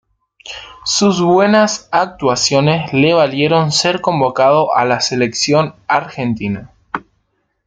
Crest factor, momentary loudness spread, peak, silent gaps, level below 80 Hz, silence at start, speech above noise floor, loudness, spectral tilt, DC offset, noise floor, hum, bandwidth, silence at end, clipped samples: 14 dB; 15 LU; -2 dBFS; none; -52 dBFS; 0.45 s; 52 dB; -14 LUFS; -4.5 dB/octave; under 0.1%; -65 dBFS; none; 9.6 kHz; 0.7 s; under 0.1%